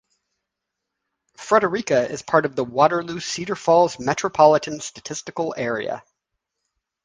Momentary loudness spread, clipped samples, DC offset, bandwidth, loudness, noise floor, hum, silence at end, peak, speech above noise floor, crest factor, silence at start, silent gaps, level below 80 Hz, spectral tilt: 14 LU; under 0.1%; under 0.1%; 10 kHz; -21 LUFS; -82 dBFS; none; 1.05 s; -2 dBFS; 62 dB; 22 dB; 1.4 s; none; -62 dBFS; -4.5 dB/octave